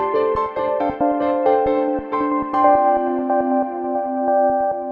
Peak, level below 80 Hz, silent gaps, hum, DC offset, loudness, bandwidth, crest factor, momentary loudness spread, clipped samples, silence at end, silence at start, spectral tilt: -2 dBFS; -48 dBFS; none; none; under 0.1%; -19 LUFS; 5.4 kHz; 16 dB; 6 LU; under 0.1%; 0 s; 0 s; -8.5 dB/octave